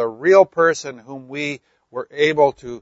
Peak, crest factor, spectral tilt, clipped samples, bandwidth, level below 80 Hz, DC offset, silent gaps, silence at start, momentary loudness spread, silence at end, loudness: 0 dBFS; 18 dB; -4.5 dB/octave; under 0.1%; 8 kHz; -60 dBFS; under 0.1%; none; 0 s; 19 LU; 0.05 s; -17 LUFS